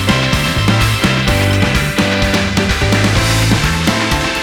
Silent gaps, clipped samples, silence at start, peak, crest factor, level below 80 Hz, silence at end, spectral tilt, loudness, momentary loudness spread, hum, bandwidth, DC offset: none; under 0.1%; 0 s; 0 dBFS; 12 dB; -24 dBFS; 0 s; -4.5 dB/octave; -13 LUFS; 2 LU; none; over 20 kHz; under 0.1%